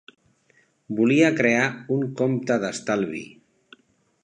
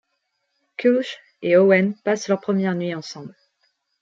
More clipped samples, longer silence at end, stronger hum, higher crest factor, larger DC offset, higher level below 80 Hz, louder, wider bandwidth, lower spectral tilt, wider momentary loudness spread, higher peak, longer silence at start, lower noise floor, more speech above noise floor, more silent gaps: neither; first, 1 s vs 0.7 s; neither; about the same, 20 dB vs 20 dB; neither; about the same, -70 dBFS vs -72 dBFS; about the same, -22 LUFS vs -20 LUFS; first, 10 kHz vs 7.6 kHz; about the same, -5.5 dB/octave vs -6 dB/octave; second, 13 LU vs 17 LU; about the same, -4 dBFS vs -2 dBFS; about the same, 0.9 s vs 0.8 s; second, -63 dBFS vs -74 dBFS; second, 41 dB vs 54 dB; neither